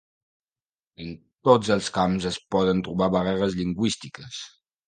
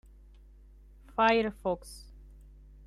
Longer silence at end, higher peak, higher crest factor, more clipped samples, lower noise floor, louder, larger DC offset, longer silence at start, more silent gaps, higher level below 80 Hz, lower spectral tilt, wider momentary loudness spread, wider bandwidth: second, 0.4 s vs 0.85 s; first, -2 dBFS vs -12 dBFS; about the same, 22 dB vs 22 dB; neither; first, under -90 dBFS vs -54 dBFS; first, -24 LUFS vs -29 LUFS; neither; second, 1 s vs 1.15 s; neither; about the same, -52 dBFS vs -52 dBFS; about the same, -5.5 dB/octave vs -5 dB/octave; second, 19 LU vs 22 LU; second, 9.6 kHz vs 13 kHz